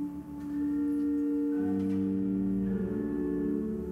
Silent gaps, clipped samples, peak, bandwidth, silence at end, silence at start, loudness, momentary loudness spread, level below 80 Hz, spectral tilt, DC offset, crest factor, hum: none; under 0.1%; -20 dBFS; 3.4 kHz; 0 s; 0 s; -31 LUFS; 4 LU; -52 dBFS; -10 dB/octave; under 0.1%; 10 dB; none